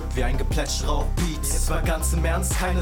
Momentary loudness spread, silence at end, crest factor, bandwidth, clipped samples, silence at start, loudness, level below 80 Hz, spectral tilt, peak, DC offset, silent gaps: 3 LU; 0 s; 12 dB; 18.5 kHz; under 0.1%; 0 s; -25 LUFS; -24 dBFS; -4.5 dB/octave; -10 dBFS; under 0.1%; none